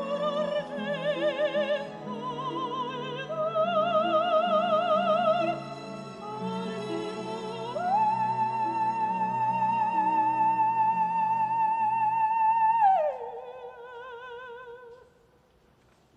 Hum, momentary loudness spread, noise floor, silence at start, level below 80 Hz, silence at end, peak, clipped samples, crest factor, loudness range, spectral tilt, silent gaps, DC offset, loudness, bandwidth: none; 16 LU; -62 dBFS; 0 s; -70 dBFS; 1.2 s; -14 dBFS; under 0.1%; 14 dB; 5 LU; -6 dB/octave; none; under 0.1%; -27 LUFS; 9.8 kHz